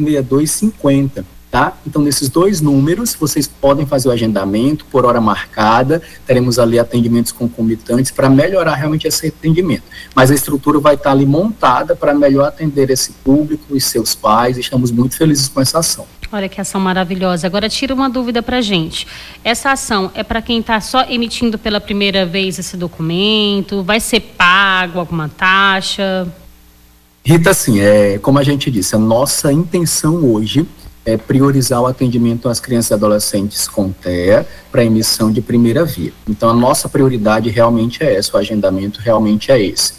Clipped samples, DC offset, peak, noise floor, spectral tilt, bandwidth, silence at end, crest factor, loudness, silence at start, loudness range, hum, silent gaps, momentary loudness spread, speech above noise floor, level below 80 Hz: under 0.1%; under 0.1%; 0 dBFS; -46 dBFS; -4.5 dB/octave; 16 kHz; 0 s; 12 dB; -13 LUFS; 0 s; 3 LU; none; none; 7 LU; 33 dB; -38 dBFS